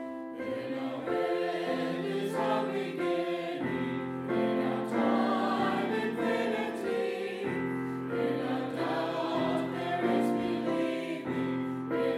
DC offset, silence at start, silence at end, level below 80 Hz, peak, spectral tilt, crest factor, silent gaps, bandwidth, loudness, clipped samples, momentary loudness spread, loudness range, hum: under 0.1%; 0 s; 0 s; -72 dBFS; -16 dBFS; -6.5 dB/octave; 14 dB; none; 14.5 kHz; -32 LUFS; under 0.1%; 6 LU; 2 LU; none